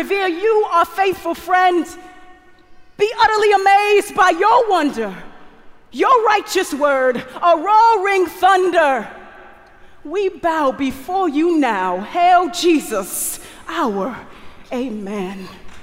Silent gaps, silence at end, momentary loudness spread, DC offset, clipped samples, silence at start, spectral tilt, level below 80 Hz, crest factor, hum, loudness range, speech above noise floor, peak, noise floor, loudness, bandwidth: none; 0 s; 13 LU; under 0.1%; under 0.1%; 0 s; -3.5 dB/octave; -50 dBFS; 16 dB; none; 4 LU; 27 dB; -2 dBFS; -43 dBFS; -16 LUFS; 16 kHz